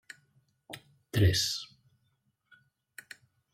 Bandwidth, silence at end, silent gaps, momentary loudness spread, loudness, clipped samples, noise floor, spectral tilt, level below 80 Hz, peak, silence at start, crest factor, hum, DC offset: 15.5 kHz; 1.9 s; none; 26 LU; -29 LUFS; under 0.1%; -76 dBFS; -4 dB/octave; -54 dBFS; -16 dBFS; 0.7 s; 20 dB; none; under 0.1%